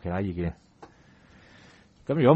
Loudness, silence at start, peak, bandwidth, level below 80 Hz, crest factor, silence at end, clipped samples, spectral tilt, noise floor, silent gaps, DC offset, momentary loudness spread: -30 LUFS; 0.05 s; -6 dBFS; 8 kHz; -50 dBFS; 22 dB; 0 s; under 0.1%; -9.5 dB/octave; -56 dBFS; none; under 0.1%; 25 LU